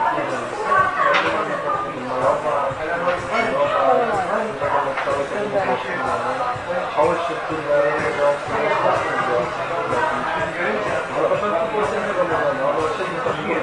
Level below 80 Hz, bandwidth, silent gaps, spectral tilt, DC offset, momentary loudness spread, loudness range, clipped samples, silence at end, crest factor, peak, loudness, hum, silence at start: -52 dBFS; 11.5 kHz; none; -5 dB/octave; under 0.1%; 5 LU; 1 LU; under 0.1%; 0 s; 16 dB; -4 dBFS; -20 LUFS; none; 0 s